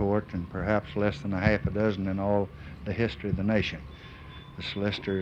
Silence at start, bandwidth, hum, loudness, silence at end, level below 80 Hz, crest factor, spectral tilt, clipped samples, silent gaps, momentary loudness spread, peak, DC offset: 0 s; 7.8 kHz; none; -29 LUFS; 0 s; -46 dBFS; 20 dB; -7.5 dB/octave; under 0.1%; none; 16 LU; -8 dBFS; under 0.1%